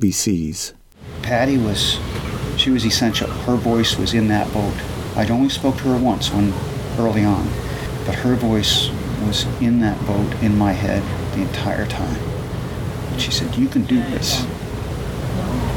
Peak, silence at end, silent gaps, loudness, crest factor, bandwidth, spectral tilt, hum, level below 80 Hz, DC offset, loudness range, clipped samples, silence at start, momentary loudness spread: -4 dBFS; 0 s; none; -20 LUFS; 16 dB; 18.5 kHz; -5 dB/octave; none; -34 dBFS; under 0.1%; 3 LU; under 0.1%; 0 s; 9 LU